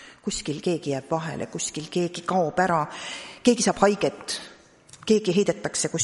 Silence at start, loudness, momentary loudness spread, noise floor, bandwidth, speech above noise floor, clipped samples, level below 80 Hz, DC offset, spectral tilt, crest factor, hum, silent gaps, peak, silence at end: 0 s; -25 LUFS; 11 LU; -51 dBFS; 11.5 kHz; 27 dB; under 0.1%; -56 dBFS; under 0.1%; -4 dB/octave; 20 dB; none; none; -4 dBFS; 0 s